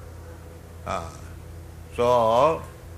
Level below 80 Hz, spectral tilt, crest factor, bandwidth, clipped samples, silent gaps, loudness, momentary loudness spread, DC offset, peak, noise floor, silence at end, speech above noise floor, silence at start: -48 dBFS; -5.5 dB/octave; 20 dB; 15 kHz; under 0.1%; none; -23 LUFS; 23 LU; under 0.1%; -6 dBFS; -42 dBFS; 0 s; 20 dB; 0 s